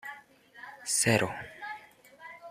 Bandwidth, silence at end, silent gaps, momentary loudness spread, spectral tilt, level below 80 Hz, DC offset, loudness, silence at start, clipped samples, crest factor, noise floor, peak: 15 kHz; 0 s; none; 24 LU; -3 dB/octave; -68 dBFS; under 0.1%; -29 LUFS; 0.05 s; under 0.1%; 24 dB; -54 dBFS; -10 dBFS